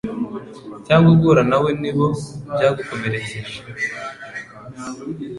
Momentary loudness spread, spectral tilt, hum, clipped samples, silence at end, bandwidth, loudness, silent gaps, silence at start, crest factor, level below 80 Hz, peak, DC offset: 20 LU; -7 dB/octave; none; under 0.1%; 0 s; 11.5 kHz; -18 LUFS; none; 0.05 s; 16 dB; -48 dBFS; -2 dBFS; under 0.1%